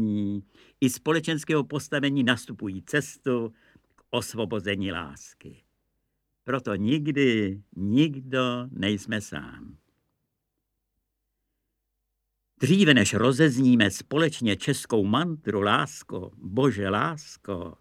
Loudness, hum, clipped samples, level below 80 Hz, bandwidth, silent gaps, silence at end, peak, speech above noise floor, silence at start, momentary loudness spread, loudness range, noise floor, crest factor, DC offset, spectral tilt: -25 LUFS; none; under 0.1%; -62 dBFS; 15.5 kHz; none; 0.05 s; -4 dBFS; 55 dB; 0 s; 15 LU; 10 LU; -81 dBFS; 22 dB; under 0.1%; -5 dB/octave